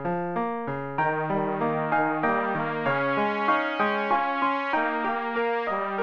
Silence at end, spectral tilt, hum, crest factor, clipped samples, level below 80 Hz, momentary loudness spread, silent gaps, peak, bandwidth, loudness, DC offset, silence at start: 0 s; -7.5 dB/octave; none; 14 dB; under 0.1%; -64 dBFS; 4 LU; none; -12 dBFS; 7 kHz; -26 LUFS; under 0.1%; 0 s